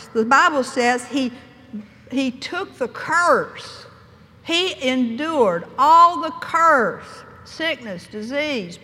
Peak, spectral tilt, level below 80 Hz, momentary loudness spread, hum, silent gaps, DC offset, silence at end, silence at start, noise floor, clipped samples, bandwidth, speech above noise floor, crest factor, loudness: -2 dBFS; -3.5 dB/octave; -62 dBFS; 21 LU; none; none; under 0.1%; 0.05 s; 0 s; -47 dBFS; under 0.1%; 14.5 kHz; 28 dB; 18 dB; -19 LUFS